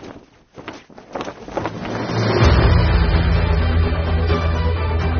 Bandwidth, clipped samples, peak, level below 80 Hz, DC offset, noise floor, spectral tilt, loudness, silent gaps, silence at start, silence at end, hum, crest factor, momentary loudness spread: 6.6 kHz; under 0.1%; -2 dBFS; -22 dBFS; under 0.1%; -42 dBFS; -6 dB/octave; -18 LUFS; none; 0 s; 0 s; none; 14 dB; 20 LU